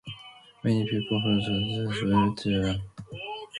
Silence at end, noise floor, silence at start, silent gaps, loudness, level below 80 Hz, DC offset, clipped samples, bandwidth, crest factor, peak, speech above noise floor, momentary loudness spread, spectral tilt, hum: 0 s; -50 dBFS; 0.05 s; none; -27 LUFS; -50 dBFS; under 0.1%; under 0.1%; 11.5 kHz; 18 dB; -10 dBFS; 24 dB; 16 LU; -6.5 dB/octave; none